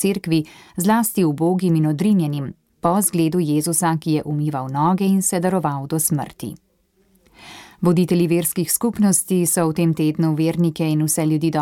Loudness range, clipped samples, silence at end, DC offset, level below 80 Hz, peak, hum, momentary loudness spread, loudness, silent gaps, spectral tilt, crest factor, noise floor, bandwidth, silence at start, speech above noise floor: 3 LU; under 0.1%; 0 s; under 0.1%; -56 dBFS; -4 dBFS; none; 6 LU; -19 LUFS; none; -5.5 dB/octave; 14 dB; -61 dBFS; 17 kHz; 0 s; 43 dB